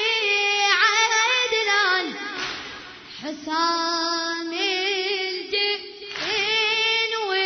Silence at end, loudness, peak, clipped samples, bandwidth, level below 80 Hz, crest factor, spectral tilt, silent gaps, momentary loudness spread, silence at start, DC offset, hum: 0 s; -21 LUFS; -4 dBFS; under 0.1%; 6.6 kHz; -66 dBFS; 20 dB; 0 dB/octave; none; 15 LU; 0 s; under 0.1%; none